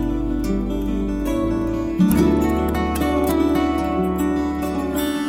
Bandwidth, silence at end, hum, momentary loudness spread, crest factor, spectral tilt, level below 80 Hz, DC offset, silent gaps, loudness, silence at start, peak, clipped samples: 17 kHz; 0 s; none; 6 LU; 16 dB; -6.5 dB/octave; -30 dBFS; under 0.1%; none; -20 LUFS; 0 s; -4 dBFS; under 0.1%